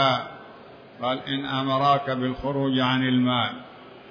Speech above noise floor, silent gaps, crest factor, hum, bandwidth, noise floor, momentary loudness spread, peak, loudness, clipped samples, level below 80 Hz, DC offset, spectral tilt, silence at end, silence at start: 22 dB; none; 18 dB; none; 5.2 kHz; -46 dBFS; 18 LU; -8 dBFS; -24 LUFS; under 0.1%; -56 dBFS; under 0.1%; -7 dB/octave; 0 s; 0 s